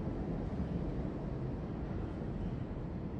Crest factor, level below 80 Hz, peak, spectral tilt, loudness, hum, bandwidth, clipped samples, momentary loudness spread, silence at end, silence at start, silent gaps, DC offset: 14 dB; -46 dBFS; -26 dBFS; -10 dB/octave; -40 LUFS; none; 8 kHz; under 0.1%; 3 LU; 0 s; 0 s; none; under 0.1%